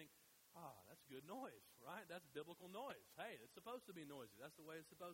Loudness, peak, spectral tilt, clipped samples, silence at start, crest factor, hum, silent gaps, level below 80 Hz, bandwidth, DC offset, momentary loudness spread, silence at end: -57 LUFS; -38 dBFS; -4 dB/octave; under 0.1%; 0 s; 20 dB; none; none; under -90 dBFS; 16 kHz; under 0.1%; 6 LU; 0 s